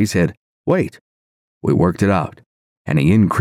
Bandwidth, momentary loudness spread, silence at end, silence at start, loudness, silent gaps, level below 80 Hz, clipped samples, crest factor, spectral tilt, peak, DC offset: 15.5 kHz; 13 LU; 0 s; 0 s; -18 LUFS; 0.37-0.64 s, 1.01-1.61 s, 2.46-2.85 s; -46 dBFS; under 0.1%; 14 dB; -7 dB/octave; -4 dBFS; under 0.1%